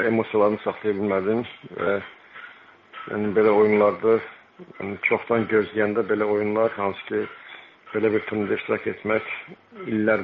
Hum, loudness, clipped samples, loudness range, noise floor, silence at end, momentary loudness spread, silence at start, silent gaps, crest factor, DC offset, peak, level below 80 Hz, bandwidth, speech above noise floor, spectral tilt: none; -23 LUFS; under 0.1%; 4 LU; -48 dBFS; 0 s; 21 LU; 0 s; none; 16 dB; under 0.1%; -6 dBFS; -66 dBFS; 4.8 kHz; 25 dB; -5 dB/octave